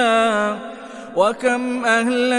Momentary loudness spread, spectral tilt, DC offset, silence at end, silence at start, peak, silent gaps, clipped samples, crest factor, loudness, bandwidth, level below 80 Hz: 13 LU; -3.5 dB/octave; under 0.1%; 0 s; 0 s; -2 dBFS; none; under 0.1%; 16 dB; -19 LUFS; 11.5 kHz; -64 dBFS